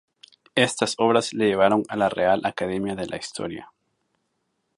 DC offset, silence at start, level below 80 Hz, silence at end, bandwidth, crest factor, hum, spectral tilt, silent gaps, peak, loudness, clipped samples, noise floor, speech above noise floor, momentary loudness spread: under 0.1%; 0.55 s; -60 dBFS; 1.15 s; 11.5 kHz; 22 dB; none; -4 dB/octave; none; -2 dBFS; -23 LUFS; under 0.1%; -75 dBFS; 52 dB; 11 LU